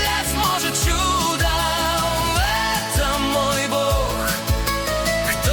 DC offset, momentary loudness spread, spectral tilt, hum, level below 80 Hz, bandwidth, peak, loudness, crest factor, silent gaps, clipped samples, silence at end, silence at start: under 0.1%; 2 LU; -3 dB/octave; none; -28 dBFS; 19 kHz; -4 dBFS; -20 LUFS; 16 dB; none; under 0.1%; 0 s; 0 s